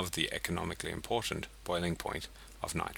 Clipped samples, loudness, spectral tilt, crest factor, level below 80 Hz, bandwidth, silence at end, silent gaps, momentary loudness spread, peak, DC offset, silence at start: under 0.1%; -36 LUFS; -3.5 dB/octave; 24 dB; -52 dBFS; 19.5 kHz; 0 s; none; 8 LU; -14 dBFS; under 0.1%; 0 s